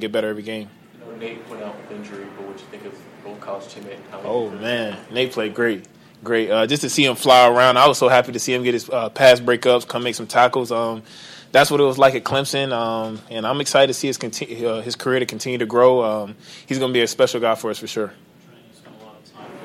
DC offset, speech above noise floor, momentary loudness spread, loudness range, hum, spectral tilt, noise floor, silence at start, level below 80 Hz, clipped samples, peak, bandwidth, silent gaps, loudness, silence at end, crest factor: under 0.1%; 29 dB; 22 LU; 15 LU; none; -3.5 dB/octave; -48 dBFS; 0 s; -64 dBFS; under 0.1%; -2 dBFS; 16 kHz; none; -18 LUFS; 0 s; 18 dB